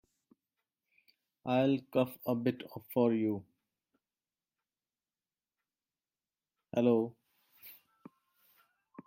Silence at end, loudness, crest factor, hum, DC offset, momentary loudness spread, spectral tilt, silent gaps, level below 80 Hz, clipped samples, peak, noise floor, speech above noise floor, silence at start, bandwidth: 1.35 s; -33 LUFS; 22 dB; none; under 0.1%; 21 LU; -8 dB/octave; none; -82 dBFS; under 0.1%; -16 dBFS; under -90 dBFS; over 59 dB; 1.45 s; 16.5 kHz